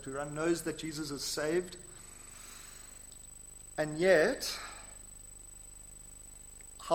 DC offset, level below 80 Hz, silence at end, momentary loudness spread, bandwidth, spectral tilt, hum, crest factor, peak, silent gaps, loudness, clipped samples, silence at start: under 0.1%; -56 dBFS; 0 s; 21 LU; 16.5 kHz; -3.5 dB/octave; 50 Hz at -60 dBFS; 24 dB; -12 dBFS; none; -33 LUFS; under 0.1%; 0 s